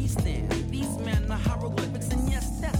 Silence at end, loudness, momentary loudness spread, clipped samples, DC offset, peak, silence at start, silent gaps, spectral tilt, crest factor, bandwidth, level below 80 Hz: 0 s; -29 LUFS; 2 LU; under 0.1%; 0.1%; -14 dBFS; 0 s; none; -6 dB/octave; 14 dB; 18 kHz; -32 dBFS